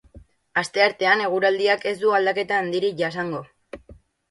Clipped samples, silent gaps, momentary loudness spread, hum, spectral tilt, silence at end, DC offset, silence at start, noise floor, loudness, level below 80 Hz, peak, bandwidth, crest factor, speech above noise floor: under 0.1%; none; 13 LU; none; -4.5 dB/octave; 0.4 s; under 0.1%; 0.15 s; -50 dBFS; -21 LUFS; -58 dBFS; -4 dBFS; 11.5 kHz; 18 dB; 29 dB